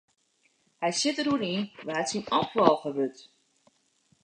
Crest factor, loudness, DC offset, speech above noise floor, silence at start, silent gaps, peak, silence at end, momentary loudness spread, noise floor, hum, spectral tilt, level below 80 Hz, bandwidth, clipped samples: 28 dB; -28 LUFS; under 0.1%; 42 dB; 0.8 s; none; -2 dBFS; 1 s; 9 LU; -69 dBFS; none; -4 dB/octave; -70 dBFS; 10 kHz; under 0.1%